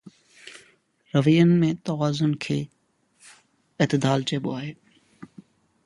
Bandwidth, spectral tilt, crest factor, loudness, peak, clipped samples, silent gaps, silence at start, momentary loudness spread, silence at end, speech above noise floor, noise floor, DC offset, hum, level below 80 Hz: 11.5 kHz; -6.5 dB/octave; 20 dB; -23 LUFS; -6 dBFS; under 0.1%; none; 0.05 s; 21 LU; 0.6 s; 39 dB; -60 dBFS; under 0.1%; none; -64 dBFS